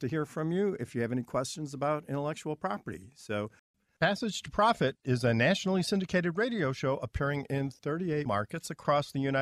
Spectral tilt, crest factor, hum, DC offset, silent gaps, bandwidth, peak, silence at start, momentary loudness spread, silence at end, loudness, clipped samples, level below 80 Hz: -5.5 dB/octave; 18 dB; none; under 0.1%; 3.59-3.74 s; 14 kHz; -12 dBFS; 0 s; 10 LU; 0 s; -31 LUFS; under 0.1%; -56 dBFS